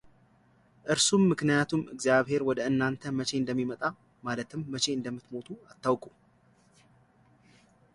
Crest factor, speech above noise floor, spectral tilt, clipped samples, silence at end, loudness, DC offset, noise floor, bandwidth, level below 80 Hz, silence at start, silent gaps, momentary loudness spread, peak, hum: 20 dB; 35 dB; -4 dB/octave; under 0.1%; 1.85 s; -29 LUFS; under 0.1%; -64 dBFS; 11.5 kHz; -66 dBFS; 0.85 s; none; 15 LU; -12 dBFS; none